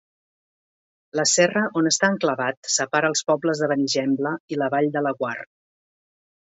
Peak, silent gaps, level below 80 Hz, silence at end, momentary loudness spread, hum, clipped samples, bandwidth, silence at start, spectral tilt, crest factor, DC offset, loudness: -4 dBFS; 2.57-2.63 s, 4.40-4.48 s; -72 dBFS; 1.05 s; 8 LU; none; under 0.1%; 8.2 kHz; 1.15 s; -3 dB/octave; 18 dB; under 0.1%; -22 LUFS